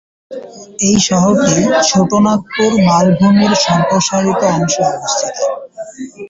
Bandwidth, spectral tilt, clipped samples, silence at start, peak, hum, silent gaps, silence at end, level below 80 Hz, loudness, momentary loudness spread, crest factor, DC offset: 7.8 kHz; -4.5 dB/octave; under 0.1%; 0.3 s; 0 dBFS; none; none; 0.05 s; -46 dBFS; -12 LUFS; 18 LU; 12 dB; under 0.1%